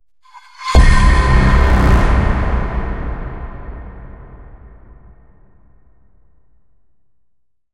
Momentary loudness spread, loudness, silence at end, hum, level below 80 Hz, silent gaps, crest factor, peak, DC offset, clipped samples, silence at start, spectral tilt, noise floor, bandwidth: 21 LU; -15 LUFS; 3.3 s; none; -16 dBFS; none; 16 dB; 0 dBFS; 0.4%; under 0.1%; 0.35 s; -6.5 dB/octave; -64 dBFS; 11 kHz